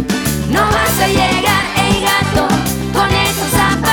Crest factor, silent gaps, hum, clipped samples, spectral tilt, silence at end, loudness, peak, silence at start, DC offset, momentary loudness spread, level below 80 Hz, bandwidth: 12 dB; none; none; under 0.1%; -4 dB/octave; 0 s; -13 LUFS; -2 dBFS; 0 s; under 0.1%; 3 LU; -28 dBFS; over 20 kHz